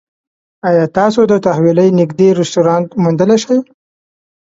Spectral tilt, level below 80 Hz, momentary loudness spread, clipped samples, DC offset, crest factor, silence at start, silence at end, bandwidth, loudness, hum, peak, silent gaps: -7 dB/octave; -54 dBFS; 4 LU; under 0.1%; under 0.1%; 12 dB; 0.65 s; 0.95 s; 7.8 kHz; -12 LUFS; none; 0 dBFS; none